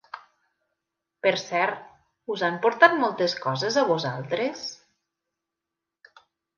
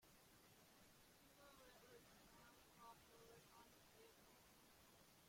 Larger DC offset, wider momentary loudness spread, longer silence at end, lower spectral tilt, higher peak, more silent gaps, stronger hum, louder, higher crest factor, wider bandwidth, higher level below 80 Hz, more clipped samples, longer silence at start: neither; first, 19 LU vs 4 LU; first, 1.85 s vs 0 s; first, -4.5 dB/octave vs -3 dB/octave; first, -2 dBFS vs -52 dBFS; neither; neither; first, -24 LUFS vs -68 LUFS; first, 26 dB vs 16 dB; second, 7.2 kHz vs 16.5 kHz; first, -76 dBFS vs -84 dBFS; neither; first, 0.15 s vs 0 s